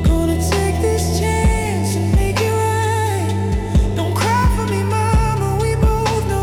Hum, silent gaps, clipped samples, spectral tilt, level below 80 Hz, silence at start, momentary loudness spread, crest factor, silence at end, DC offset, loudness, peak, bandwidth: none; none; under 0.1%; -6 dB/octave; -22 dBFS; 0 s; 3 LU; 10 dB; 0 s; under 0.1%; -17 LUFS; -6 dBFS; 17.5 kHz